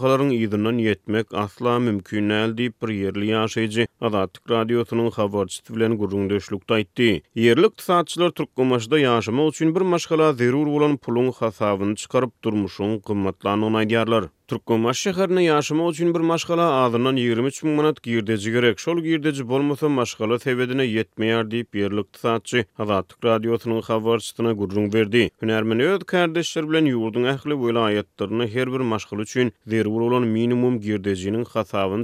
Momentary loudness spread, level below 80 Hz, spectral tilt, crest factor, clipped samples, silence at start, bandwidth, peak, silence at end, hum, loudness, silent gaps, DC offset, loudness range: 6 LU; -62 dBFS; -6 dB/octave; 18 dB; under 0.1%; 0 s; 15 kHz; -4 dBFS; 0 s; none; -22 LUFS; none; under 0.1%; 3 LU